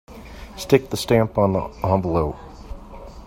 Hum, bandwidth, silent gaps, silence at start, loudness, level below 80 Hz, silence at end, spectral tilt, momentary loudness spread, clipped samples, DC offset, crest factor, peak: none; 16.5 kHz; none; 0.1 s; -21 LUFS; -40 dBFS; 0 s; -6.5 dB/octave; 21 LU; under 0.1%; under 0.1%; 20 dB; -2 dBFS